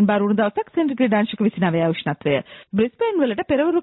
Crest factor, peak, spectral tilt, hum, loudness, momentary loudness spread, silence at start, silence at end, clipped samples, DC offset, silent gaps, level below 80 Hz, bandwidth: 12 dB; -8 dBFS; -12 dB/octave; none; -21 LUFS; 4 LU; 0 s; 0 s; under 0.1%; under 0.1%; none; -56 dBFS; 4.1 kHz